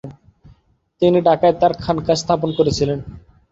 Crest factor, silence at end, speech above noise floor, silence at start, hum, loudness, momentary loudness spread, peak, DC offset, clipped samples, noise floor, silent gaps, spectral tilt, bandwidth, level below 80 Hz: 16 dB; 0.3 s; 39 dB; 0.05 s; none; -17 LUFS; 11 LU; -2 dBFS; under 0.1%; under 0.1%; -56 dBFS; none; -6 dB/octave; 8 kHz; -44 dBFS